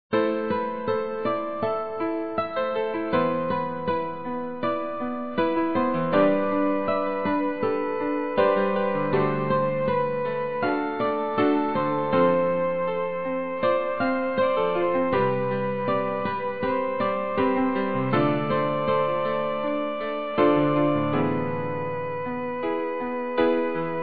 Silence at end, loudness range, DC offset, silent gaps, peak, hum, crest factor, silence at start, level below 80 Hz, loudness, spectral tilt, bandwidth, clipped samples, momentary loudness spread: 0 s; 3 LU; 0.8%; none; -8 dBFS; none; 16 dB; 0.1 s; -60 dBFS; -25 LUFS; -10.5 dB/octave; 4.8 kHz; under 0.1%; 7 LU